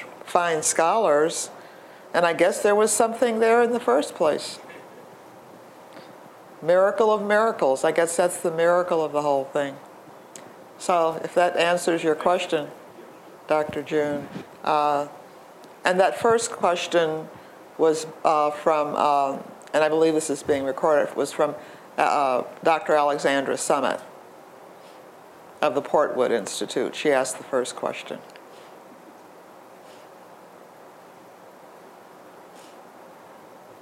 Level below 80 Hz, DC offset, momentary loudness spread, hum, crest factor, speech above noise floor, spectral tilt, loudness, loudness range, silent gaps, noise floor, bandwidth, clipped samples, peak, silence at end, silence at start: -74 dBFS; under 0.1%; 14 LU; none; 22 dB; 25 dB; -3.5 dB/octave; -23 LUFS; 5 LU; none; -47 dBFS; 16 kHz; under 0.1%; -2 dBFS; 0.05 s; 0 s